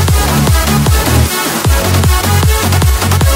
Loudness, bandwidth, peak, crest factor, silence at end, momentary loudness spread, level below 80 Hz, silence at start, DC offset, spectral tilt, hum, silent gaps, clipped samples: -10 LUFS; 16.5 kHz; 0 dBFS; 10 dB; 0 s; 1 LU; -14 dBFS; 0 s; under 0.1%; -4.5 dB/octave; none; none; under 0.1%